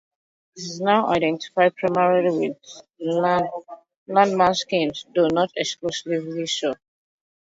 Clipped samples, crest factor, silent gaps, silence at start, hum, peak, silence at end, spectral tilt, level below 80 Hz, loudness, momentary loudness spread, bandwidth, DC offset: under 0.1%; 18 dB; 3.96-4.06 s; 0.55 s; none; -4 dBFS; 0.8 s; -4.5 dB/octave; -62 dBFS; -22 LUFS; 11 LU; 8 kHz; under 0.1%